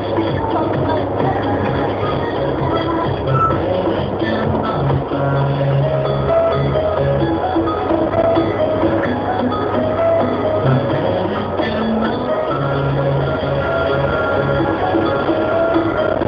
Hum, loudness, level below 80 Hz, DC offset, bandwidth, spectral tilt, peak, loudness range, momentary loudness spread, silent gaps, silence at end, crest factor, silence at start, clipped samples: none; -17 LUFS; -36 dBFS; under 0.1%; 5.4 kHz; -9.5 dB/octave; -2 dBFS; 1 LU; 3 LU; none; 0 s; 16 dB; 0 s; under 0.1%